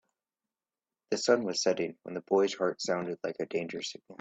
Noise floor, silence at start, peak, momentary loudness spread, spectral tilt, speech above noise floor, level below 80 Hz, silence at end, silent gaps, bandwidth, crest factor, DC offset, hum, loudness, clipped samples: under -90 dBFS; 1.1 s; -12 dBFS; 10 LU; -3.5 dB/octave; over 59 dB; -76 dBFS; 0.05 s; none; 8.4 kHz; 22 dB; under 0.1%; none; -31 LUFS; under 0.1%